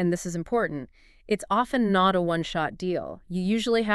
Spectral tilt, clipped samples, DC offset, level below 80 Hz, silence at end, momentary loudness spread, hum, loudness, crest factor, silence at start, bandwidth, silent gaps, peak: -5.5 dB/octave; under 0.1%; under 0.1%; -52 dBFS; 0 s; 10 LU; none; -26 LUFS; 18 dB; 0 s; 12.5 kHz; none; -8 dBFS